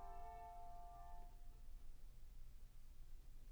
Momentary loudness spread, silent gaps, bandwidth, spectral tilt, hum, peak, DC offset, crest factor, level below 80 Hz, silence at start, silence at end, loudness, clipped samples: 9 LU; none; over 20 kHz; -5.5 dB/octave; none; -42 dBFS; under 0.1%; 10 dB; -56 dBFS; 0 s; 0 s; -62 LUFS; under 0.1%